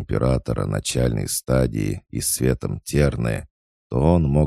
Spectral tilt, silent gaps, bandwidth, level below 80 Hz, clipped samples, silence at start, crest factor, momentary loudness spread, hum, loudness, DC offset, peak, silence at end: -5.5 dB/octave; 3.50-3.90 s; 15.5 kHz; -32 dBFS; under 0.1%; 0 s; 18 dB; 7 LU; none; -22 LUFS; under 0.1%; -2 dBFS; 0 s